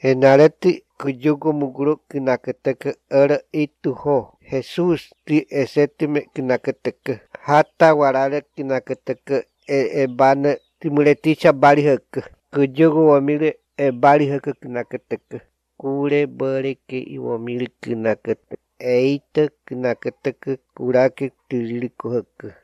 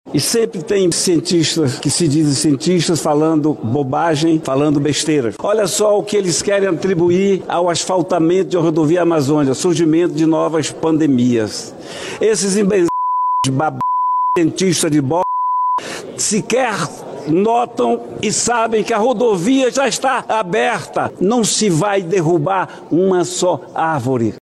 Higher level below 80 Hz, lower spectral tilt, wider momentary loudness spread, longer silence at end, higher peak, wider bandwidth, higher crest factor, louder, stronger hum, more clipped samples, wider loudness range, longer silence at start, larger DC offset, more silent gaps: second, -64 dBFS vs -54 dBFS; first, -7.5 dB/octave vs -4.5 dB/octave; first, 14 LU vs 5 LU; about the same, 0.1 s vs 0.05 s; first, 0 dBFS vs -4 dBFS; second, 11 kHz vs 13 kHz; first, 18 dB vs 10 dB; second, -19 LUFS vs -15 LUFS; neither; neither; first, 7 LU vs 2 LU; about the same, 0.05 s vs 0.05 s; neither; neither